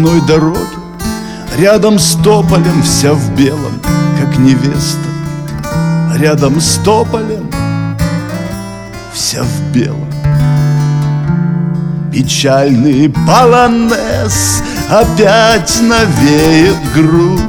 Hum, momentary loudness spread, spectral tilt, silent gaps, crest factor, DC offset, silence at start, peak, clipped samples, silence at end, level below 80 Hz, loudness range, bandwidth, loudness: none; 11 LU; -5 dB/octave; none; 10 dB; under 0.1%; 0 s; 0 dBFS; 0.9%; 0 s; -28 dBFS; 5 LU; 20 kHz; -10 LUFS